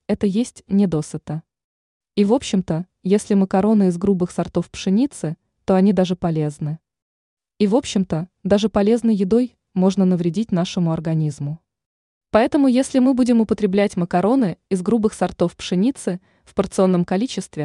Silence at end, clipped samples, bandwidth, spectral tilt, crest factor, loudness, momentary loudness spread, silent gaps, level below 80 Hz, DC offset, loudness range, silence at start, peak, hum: 0 s; under 0.1%; 11 kHz; -7 dB/octave; 16 dB; -19 LUFS; 11 LU; 1.64-2.00 s, 7.02-7.37 s, 11.86-12.21 s; -50 dBFS; under 0.1%; 3 LU; 0.1 s; -4 dBFS; none